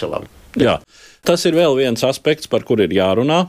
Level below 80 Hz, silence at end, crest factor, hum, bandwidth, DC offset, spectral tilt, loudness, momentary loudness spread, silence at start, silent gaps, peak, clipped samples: -48 dBFS; 0 s; 16 dB; none; 15.5 kHz; under 0.1%; -5 dB/octave; -16 LUFS; 9 LU; 0 s; none; -2 dBFS; under 0.1%